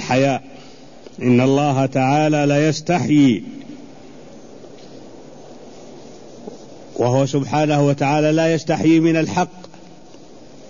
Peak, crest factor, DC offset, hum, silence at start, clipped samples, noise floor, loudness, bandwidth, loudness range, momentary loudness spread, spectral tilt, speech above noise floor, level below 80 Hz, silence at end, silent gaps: -4 dBFS; 14 dB; 0.7%; none; 0 s; under 0.1%; -43 dBFS; -17 LUFS; 7.4 kHz; 12 LU; 23 LU; -6.5 dB/octave; 27 dB; -56 dBFS; 1.05 s; none